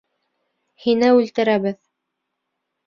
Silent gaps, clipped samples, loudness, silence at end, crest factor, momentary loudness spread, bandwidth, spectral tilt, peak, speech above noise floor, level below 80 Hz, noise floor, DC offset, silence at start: none; under 0.1%; -18 LUFS; 1.1 s; 18 dB; 12 LU; 7 kHz; -6 dB/octave; -4 dBFS; 61 dB; -66 dBFS; -78 dBFS; under 0.1%; 0.85 s